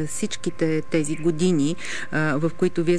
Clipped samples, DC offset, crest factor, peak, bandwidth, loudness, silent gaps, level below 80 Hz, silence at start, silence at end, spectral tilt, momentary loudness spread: under 0.1%; 4%; 14 dB; -10 dBFS; 11 kHz; -24 LUFS; none; -56 dBFS; 0 s; 0 s; -5.5 dB/octave; 6 LU